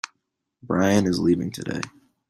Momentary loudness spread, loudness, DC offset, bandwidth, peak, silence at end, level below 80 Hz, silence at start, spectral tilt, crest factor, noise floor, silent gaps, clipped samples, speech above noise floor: 15 LU; -23 LUFS; under 0.1%; 14.5 kHz; -6 dBFS; 0.4 s; -56 dBFS; 0.05 s; -6 dB/octave; 18 dB; -77 dBFS; none; under 0.1%; 55 dB